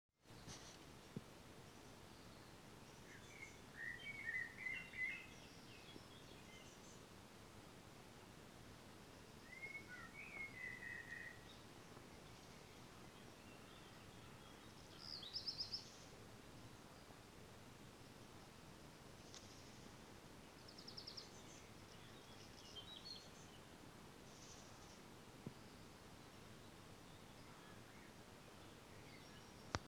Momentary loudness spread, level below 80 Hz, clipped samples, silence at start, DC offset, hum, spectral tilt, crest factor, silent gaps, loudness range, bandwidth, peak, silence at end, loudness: 13 LU; -74 dBFS; under 0.1%; 0.1 s; under 0.1%; none; -3 dB/octave; 38 dB; none; 10 LU; 19.5 kHz; -18 dBFS; 0 s; -55 LUFS